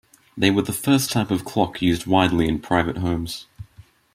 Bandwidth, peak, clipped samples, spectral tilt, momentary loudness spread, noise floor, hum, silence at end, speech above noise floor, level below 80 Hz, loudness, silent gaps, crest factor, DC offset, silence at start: 16 kHz; -2 dBFS; under 0.1%; -5 dB/octave; 8 LU; -50 dBFS; none; 0.35 s; 30 dB; -46 dBFS; -21 LUFS; none; 20 dB; under 0.1%; 0.35 s